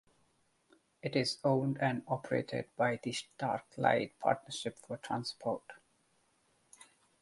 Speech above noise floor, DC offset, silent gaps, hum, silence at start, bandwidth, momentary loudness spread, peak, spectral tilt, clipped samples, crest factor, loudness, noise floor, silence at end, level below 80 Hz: 39 dB; under 0.1%; none; none; 1.05 s; 11.5 kHz; 9 LU; -14 dBFS; -5 dB/octave; under 0.1%; 24 dB; -35 LUFS; -74 dBFS; 1.45 s; -74 dBFS